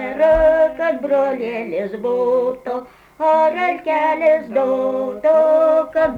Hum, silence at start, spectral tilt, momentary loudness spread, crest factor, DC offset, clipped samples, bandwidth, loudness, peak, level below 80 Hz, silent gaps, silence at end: none; 0 s; -6.5 dB/octave; 10 LU; 12 dB; under 0.1%; under 0.1%; 6.6 kHz; -17 LUFS; -6 dBFS; -42 dBFS; none; 0 s